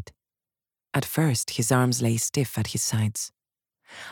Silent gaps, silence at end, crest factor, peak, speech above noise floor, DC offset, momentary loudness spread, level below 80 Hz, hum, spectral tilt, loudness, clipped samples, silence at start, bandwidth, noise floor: none; 0 s; 20 dB; -8 dBFS; over 65 dB; under 0.1%; 9 LU; -60 dBFS; none; -4.5 dB/octave; -25 LUFS; under 0.1%; 0 s; 19 kHz; under -90 dBFS